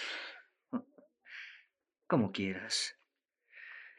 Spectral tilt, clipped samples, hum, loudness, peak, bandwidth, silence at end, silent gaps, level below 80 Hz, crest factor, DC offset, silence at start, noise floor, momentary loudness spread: -4 dB/octave; under 0.1%; none; -37 LUFS; -16 dBFS; 11 kHz; 0.05 s; none; -88 dBFS; 24 dB; under 0.1%; 0 s; -80 dBFS; 19 LU